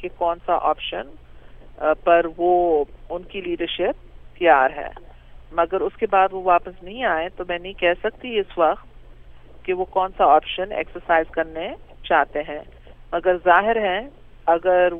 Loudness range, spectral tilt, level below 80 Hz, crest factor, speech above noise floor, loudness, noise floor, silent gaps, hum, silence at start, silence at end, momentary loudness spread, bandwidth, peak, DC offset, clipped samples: 2 LU; -7.5 dB/octave; -44 dBFS; 20 dB; 22 dB; -21 LUFS; -42 dBFS; none; none; 0 s; 0 s; 15 LU; 3.9 kHz; -2 dBFS; under 0.1%; under 0.1%